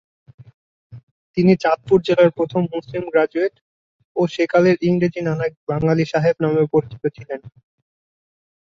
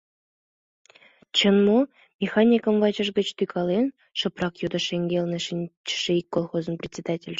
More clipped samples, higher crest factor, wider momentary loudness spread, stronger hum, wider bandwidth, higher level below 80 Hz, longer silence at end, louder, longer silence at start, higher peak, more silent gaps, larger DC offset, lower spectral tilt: neither; about the same, 18 dB vs 18 dB; about the same, 11 LU vs 11 LU; neither; about the same, 7.4 kHz vs 7.8 kHz; first, -56 dBFS vs -64 dBFS; first, 1.25 s vs 0 s; first, -19 LUFS vs -24 LUFS; second, 0.9 s vs 1.35 s; first, -2 dBFS vs -6 dBFS; first, 1.03-1.34 s, 3.61-4.15 s, 5.57-5.67 s vs 2.14-2.19 s, 5.77-5.84 s; neither; first, -8 dB/octave vs -5.5 dB/octave